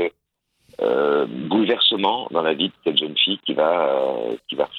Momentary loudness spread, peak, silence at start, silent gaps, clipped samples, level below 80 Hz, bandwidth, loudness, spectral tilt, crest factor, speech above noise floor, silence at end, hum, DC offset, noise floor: 9 LU; -4 dBFS; 0 s; none; under 0.1%; -70 dBFS; 5.6 kHz; -20 LUFS; -6.5 dB/octave; 18 dB; 51 dB; 0 s; none; under 0.1%; -72 dBFS